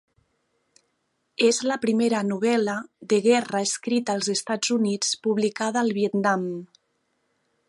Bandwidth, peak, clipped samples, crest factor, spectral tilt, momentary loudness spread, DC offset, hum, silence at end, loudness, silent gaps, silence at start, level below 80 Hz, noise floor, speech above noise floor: 11.5 kHz; -8 dBFS; under 0.1%; 18 dB; -3.5 dB/octave; 5 LU; under 0.1%; none; 1.05 s; -24 LUFS; none; 1.4 s; -74 dBFS; -74 dBFS; 50 dB